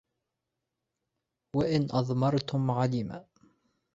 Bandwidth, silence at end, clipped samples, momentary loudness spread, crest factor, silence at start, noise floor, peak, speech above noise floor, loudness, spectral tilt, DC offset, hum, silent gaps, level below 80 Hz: 7.8 kHz; 0.75 s; under 0.1%; 8 LU; 18 dB; 1.55 s; -86 dBFS; -14 dBFS; 57 dB; -29 LUFS; -8 dB/octave; under 0.1%; none; none; -62 dBFS